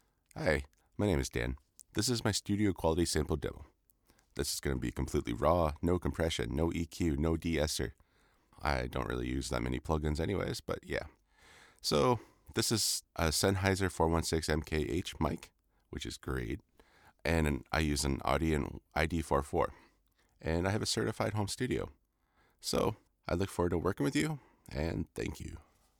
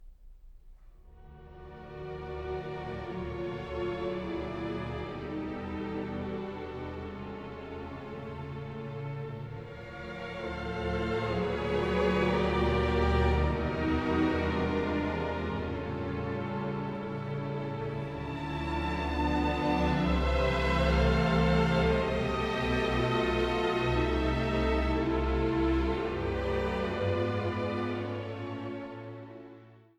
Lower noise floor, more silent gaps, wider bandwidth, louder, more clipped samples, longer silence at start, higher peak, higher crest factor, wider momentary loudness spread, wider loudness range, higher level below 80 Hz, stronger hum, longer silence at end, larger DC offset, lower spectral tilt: first, -73 dBFS vs -53 dBFS; neither; first, 20 kHz vs 9.8 kHz; second, -34 LUFS vs -31 LUFS; neither; first, 0.35 s vs 0 s; about the same, -14 dBFS vs -14 dBFS; about the same, 20 dB vs 16 dB; second, 11 LU vs 14 LU; second, 4 LU vs 12 LU; second, -46 dBFS vs -38 dBFS; neither; first, 0.4 s vs 0.2 s; neither; second, -4.5 dB/octave vs -7 dB/octave